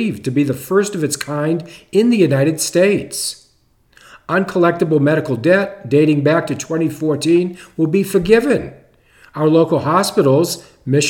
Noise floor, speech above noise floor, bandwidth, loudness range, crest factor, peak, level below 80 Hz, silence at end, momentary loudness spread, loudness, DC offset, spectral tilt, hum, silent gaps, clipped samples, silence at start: -56 dBFS; 41 dB; 18 kHz; 2 LU; 16 dB; 0 dBFS; -50 dBFS; 0 s; 8 LU; -16 LUFS; under 0.1%; -5.5 dB/octave; none; none; under 0.1%; 0 s